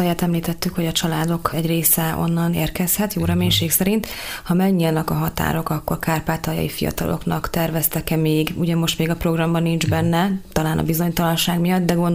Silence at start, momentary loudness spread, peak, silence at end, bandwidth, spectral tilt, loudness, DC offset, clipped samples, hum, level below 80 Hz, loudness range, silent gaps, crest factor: 0 s; 6 LU; -2 dBFS; 0 s; 16 kHz; -5 dB/octave; -20 LUFS; under 0.1%; under 0.1%; none; -38 dBFS; 3 LU; none; 18 dB